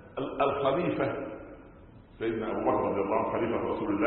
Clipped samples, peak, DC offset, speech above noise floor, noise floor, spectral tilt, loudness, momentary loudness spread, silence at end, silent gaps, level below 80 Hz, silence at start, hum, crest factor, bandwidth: under 0.1%; -14 dBFS; under 0.1%; 23 dB; -52 dBFS; -10.5 dB/octave; -30 LUFS; 12 LU; 0 s; none; -56 dBFS; 0 s; none; 16 dB; 4.3 kHz